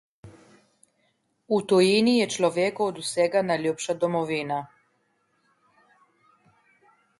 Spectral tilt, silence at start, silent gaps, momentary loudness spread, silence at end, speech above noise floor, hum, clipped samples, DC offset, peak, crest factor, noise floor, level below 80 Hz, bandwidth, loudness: -4.5 dB/octave; 0.25 s; none; 9 LU; 2.55 s; 47 dB; none; under 0.1%; under 0.1%; -8 dBFS; 18 dB; -71 dBFS; -70 dBFS; 11.5 kHz; -24 LUFS